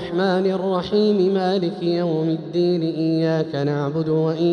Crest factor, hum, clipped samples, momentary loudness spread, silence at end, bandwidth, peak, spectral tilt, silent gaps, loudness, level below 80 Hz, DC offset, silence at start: 12 dB; none; under 0.1%; 4 LU; 0 s; 9.2 kHz; -8 dBFS; -8 dB/octave; none; -21 LUFS; -58 dBFS; under 0.1%; 0 s